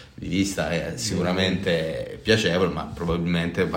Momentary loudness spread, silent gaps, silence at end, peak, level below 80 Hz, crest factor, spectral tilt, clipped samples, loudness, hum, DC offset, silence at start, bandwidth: 7 LU; none; 0 s; -6 dBFS; -44 dBFS; 18 dB; -5 dB/octave; under 0.1%; -24 LUFS; none; under 0.1%; 0 s; 16.5 kHz